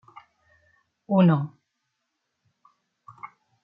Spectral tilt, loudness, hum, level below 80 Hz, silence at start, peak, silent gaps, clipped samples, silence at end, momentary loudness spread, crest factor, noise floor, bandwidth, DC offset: -11 dB/octave; -22 LUFS; none; -76 dBFS; 1.1 s; -8 dBFS; none; under 0.1%; 0.35 s; 25 LU; 20 dB; -79 dBFS; 4 kHz; under 0.1%